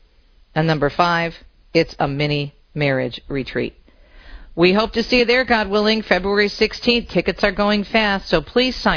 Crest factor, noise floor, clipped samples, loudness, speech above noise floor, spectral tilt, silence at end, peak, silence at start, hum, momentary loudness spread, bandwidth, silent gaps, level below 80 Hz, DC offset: 18 dB; -52 dBFS; under 0.1%; -18 LUFS; 34 dB; -6 dB/octave; 0 s; -2 dBFS; 0.55 s; none; 9 LU; 5.4 kHz; none; -38 dBFS; under 0.1%